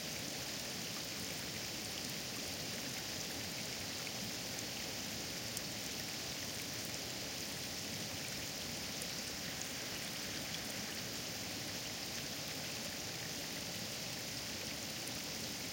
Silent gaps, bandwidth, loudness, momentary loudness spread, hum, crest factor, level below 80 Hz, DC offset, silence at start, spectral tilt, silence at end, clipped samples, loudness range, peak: none; 17 kHz; -41 LUFS; 1 LU; none; 22 dB; -66 dBFS; under 0.1%; 0 s; -2 dB/octave; 0 s; under 0.1%; 0 LU; -22 dBFS